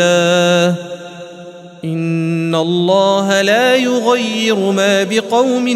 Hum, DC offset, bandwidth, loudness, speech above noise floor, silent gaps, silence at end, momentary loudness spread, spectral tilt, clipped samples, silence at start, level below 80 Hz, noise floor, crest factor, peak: none; under 0.1%; 15.5 kHz; -13 LUFS; 21 dB; none; 0 s; 17 LU; -4.5 dB/octave; under 0.1%; 0 s; -64 dBFS; -34 dBFS; 14 dB; 0 dBFS